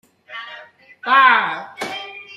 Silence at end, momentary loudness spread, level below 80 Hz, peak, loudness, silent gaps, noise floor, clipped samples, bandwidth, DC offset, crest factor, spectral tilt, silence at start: 0 s; 22 LU; -76 dBFS; -2 dBFS; -16 LUFS; none; -42 dBFS; under 0.1%; 13 kHz; under 0.1%; 18 dB; -2 dB/octave; 0.3 s